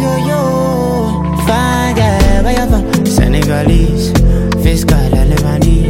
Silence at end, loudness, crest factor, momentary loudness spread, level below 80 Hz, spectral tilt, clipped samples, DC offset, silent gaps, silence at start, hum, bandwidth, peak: 0 s; -12 LUFS; 10 dB; 2 LU; -14 dBFS; -6 dB/octave; under 0.1%; under 0.1%; none; 0 s; none; 16.5 kHz; 0 dBFS